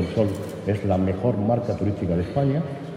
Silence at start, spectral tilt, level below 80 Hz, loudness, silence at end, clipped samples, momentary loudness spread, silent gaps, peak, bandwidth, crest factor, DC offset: 0 s; -9 dB/octave; -48 dBFS; -24 LUFS; 0 s; under 0.1%; 4 LU; none; -8 dBFS; 13.5 kHz; 16 dB; under 0.1%